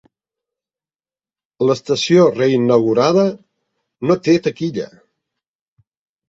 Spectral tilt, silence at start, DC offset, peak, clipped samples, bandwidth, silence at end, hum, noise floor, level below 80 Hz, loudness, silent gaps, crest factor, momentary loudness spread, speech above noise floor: -6 dB/octave; 1.6 s; under 0.1%; -2 dBFS; under 0.1%; 7.8 kHz; 1.45 s; none; under -90 dBFS; -60 dBFS; -16 LUFS; none; 16 dB; 12 LU; over 75 dB